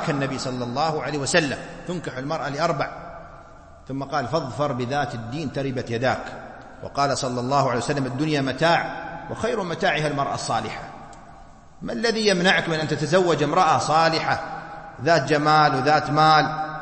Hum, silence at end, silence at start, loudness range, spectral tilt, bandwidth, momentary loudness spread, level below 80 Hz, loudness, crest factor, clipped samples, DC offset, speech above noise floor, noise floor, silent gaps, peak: none; 0 s; 0 s; 7 LU; -4.5 dB/octave; 8.8 kHz; 15 LU; -50 dBFS; -22 LUFS; 20 dB; under 0.1%; under 0.1%; 23 dB; -45 dBFS; none; -4 dBFS